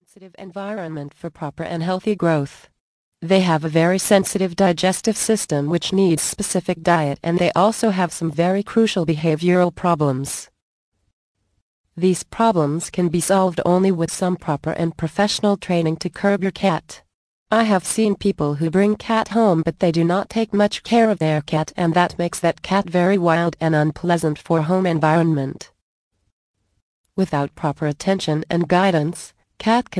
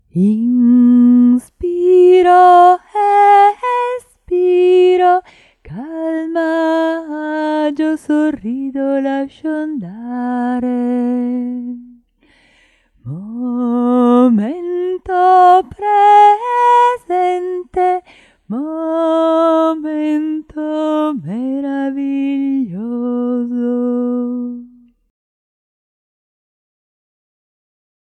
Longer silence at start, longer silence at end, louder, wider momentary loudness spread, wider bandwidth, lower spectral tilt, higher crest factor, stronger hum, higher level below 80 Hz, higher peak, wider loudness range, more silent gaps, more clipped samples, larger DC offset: about the same, 0.2 s vs 0.15 s; second, 0 s vs 3.45 s; second, -19 LUFS vs -14 LUFS; second, 8 LU vs 14 LU; about the same, 11 kHz vs 10.5 kHz; second, -5.5 dB/octave vs -7 dB/octave; about the same, 18 dB vs 14 dB; neither; about the same, -52 dBFS vs -54 dBFS; about the same, -2 dBFS vs 0 dBFS; second, 4 LU vs 11 LU; first, 2.80-3.12 s, 10.62-10.92 s, 11.13-11.35 s, 11.62-11.84 s, 17.14-17.46 s, 25.82-26.11 s, 26.32-26.54 s, 26.82-27.04 s vs none; neither; neither